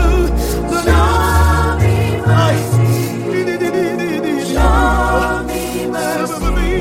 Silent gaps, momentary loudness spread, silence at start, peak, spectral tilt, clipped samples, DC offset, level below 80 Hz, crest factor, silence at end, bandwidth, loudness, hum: none; 6 LU; 0 s; -2 dBFS; -6 dB/octave; under 0.1%; under 0.1%; -20 dBFS; 12 dB; 0 s; 16.5 kHz; -15 LUFS; none